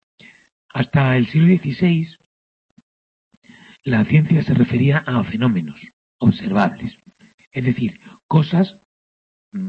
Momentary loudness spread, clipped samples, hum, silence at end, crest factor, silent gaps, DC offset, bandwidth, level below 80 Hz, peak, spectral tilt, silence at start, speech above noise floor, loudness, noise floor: 15 LU; under 0.1%; none; 0 s; 18 dB; 2.26-2.77 s, 2.83-3.31 s, 3.37-3.42 s, 5.93-6.19 s, 7.34-7.38 s, 7.47-7.51 s, 8.23-8.29 s, 8.85-9.52 s; under 0.1%; 5.6 kHz; -52 dBFS; -2 dBFS; -9 dB/octave; 0.75 s; over 73 dB; -18 LUFS; under -90 dBFS